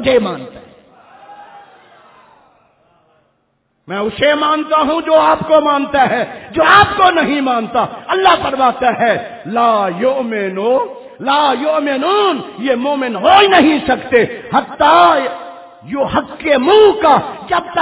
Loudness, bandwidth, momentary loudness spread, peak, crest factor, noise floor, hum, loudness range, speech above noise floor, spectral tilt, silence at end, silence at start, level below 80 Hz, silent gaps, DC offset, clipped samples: -13 LUFS; 4 kHz; 12 LU; 0 dBFS; 14 dB; -63 dBFS; none; 6 LU; 50 dB; -8.5 dB/octave; 0 s; 0 s; -46 dBFS; none; under 0.1%; under 0.1%